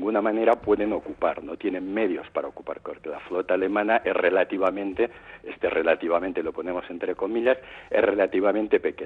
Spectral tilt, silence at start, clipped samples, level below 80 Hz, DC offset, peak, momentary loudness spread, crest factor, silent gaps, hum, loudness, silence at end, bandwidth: -7.5 dB/octave; 0 s; under 0.1%; -58 dBFS; under 0.1%; -8 dBFS; 10 LU; 18 dB; none; none; -25 LUFS; 0 s; 4.7 kHz